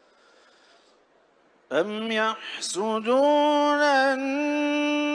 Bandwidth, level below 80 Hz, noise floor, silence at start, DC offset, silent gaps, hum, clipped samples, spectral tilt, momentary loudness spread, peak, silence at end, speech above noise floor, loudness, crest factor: 10.5 kHz; -78 dBFS; -61 dBFS; 1.7 s; under 0.1%; none; none; under 0.1%; -3 dB/octave; 8 LU; -10 dBFS; 0 s; 38 dB; -23 LUFS; 16 dB